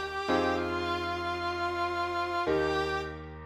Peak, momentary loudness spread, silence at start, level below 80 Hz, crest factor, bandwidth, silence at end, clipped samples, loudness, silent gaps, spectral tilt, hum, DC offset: -14 dBFS; 4 LU; 0 s; -52 dBFS; 16 dB; 15 kHz; 0 s; under 0.1%; -31 LUFS; none; -5 dB/octave; none; under 0.1%